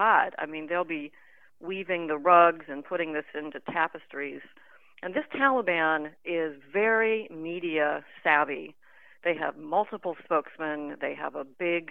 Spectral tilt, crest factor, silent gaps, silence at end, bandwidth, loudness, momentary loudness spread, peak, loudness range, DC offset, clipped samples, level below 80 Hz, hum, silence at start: -7.5 dB/octave; 22 dB; none; 0.05 s; 4.1 kHz; -28 LUFS; 13 LU; -6 dBFS; 3 LU; 0.1%; under 0.1%; -84 dBFS; none; 0 s